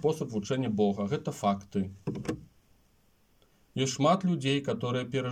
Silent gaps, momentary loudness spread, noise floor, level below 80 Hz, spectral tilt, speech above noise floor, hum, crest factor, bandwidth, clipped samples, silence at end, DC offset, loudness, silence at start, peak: none; 11 LU; -67 dBFS; -64 dBFS; -6 dB/octave; 37 dB; none; 18 dB; 15.5 kHz; under 0.1%; 0 s; under 0.1%; -30 LUFS; 0 s; -12 dBFS